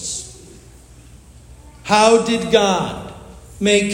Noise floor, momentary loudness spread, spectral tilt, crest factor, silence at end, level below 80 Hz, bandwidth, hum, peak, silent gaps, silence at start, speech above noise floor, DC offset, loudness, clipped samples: -43 dBFS; 22 LU; -3.5 dB/octave; 18 dB; 0 s; -44 dBFS; 16.5 kHz; none; 0 dBFS; none; 0 s; 28 dB; under 0.1%; -16 LUFS; under 0.1%